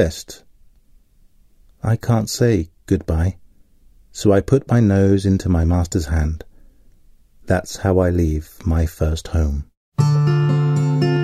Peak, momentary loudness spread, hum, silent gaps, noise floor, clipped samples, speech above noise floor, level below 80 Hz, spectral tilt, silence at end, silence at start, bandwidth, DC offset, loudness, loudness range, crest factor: -2 dBFS; 9 LU; none; 9.77-9.92 s; -52 dBFS; under 0.1%; 34 dB; -30 dBFS; -7 dB/octave; 0 s; 0 s; 14 kHz; under 0.1%; -19 LUFS; 4 LU; 16 dB